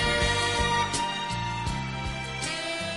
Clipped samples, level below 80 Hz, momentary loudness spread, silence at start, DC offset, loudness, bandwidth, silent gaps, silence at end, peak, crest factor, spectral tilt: under 0.1%; -40 dBFS; 8 LU; 0 s; 0.1%; -27 LUFS; 11.5 kHz; none; 0 s; -12 dBFS; 16 dB; -3 dB/octave